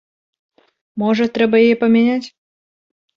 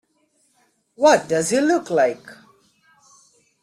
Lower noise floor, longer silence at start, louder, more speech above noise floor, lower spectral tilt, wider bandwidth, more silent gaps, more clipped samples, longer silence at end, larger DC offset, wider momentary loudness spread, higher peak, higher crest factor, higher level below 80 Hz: first, under -90 dBFS vs -65 dBFS; about the same, 0.95 s vs 1 s; first, -15 LUFS vs -18 LUFS; first, over 76 dB vs 47 dB; first, -6.5 dB/octave vs -4 dB/octave; second, 7 kHz vs 15 kHz; neither; neither; second, 0.9 s vs 1.3 s; neither; first, 14 LU vs 5 LU; about the same, -2 dBFS vs -4 dBFS; about the same, 16 dB vs 18 dB; about the same, -62 dBFS vs -64 dBFS